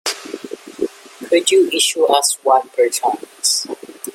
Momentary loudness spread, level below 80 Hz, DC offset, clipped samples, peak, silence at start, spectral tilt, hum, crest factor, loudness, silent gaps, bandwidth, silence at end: 16 LU; -68 dBFS; under 0.1%; under 0.1%; 0 dBFS; 0.05 s; 0 dB/octave; none; 18 dB; -16 LUFS; none; 16.5 kHz; 0.05 s